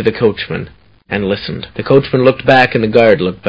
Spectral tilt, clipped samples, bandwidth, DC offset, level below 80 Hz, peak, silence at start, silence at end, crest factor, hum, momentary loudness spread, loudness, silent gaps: -8 dB/octave; 0.3%; 8 kHz; under 0.1%; -40 dBFS; 0 dBFS; 0 s; 0 s; 12 dB; none; 13 LU; -12 LUFS; none